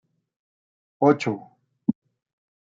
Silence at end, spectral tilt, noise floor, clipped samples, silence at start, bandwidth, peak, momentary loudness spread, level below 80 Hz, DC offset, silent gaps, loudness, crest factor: 0.7 s; -7.5 dB/octave; under -90 dBFS; under 0.1%; 1 s; 7.6 kHz; -4 dBFS; 14 LU; -76 dBFS; under 0.1%; none; -24 LUFS; 22 dB